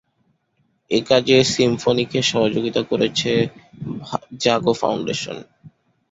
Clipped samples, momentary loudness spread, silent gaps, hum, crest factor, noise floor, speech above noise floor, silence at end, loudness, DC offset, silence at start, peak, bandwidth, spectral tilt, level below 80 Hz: under 0.1%; 14 LU; none; none; 20 dB; -66 dBFS; 47 dB; 0.45 s; -19 LUFS; under 0.1%; 0.9 s; -2 dBFS; 8 kHz; -4.5 dB/octave; -54 dBFS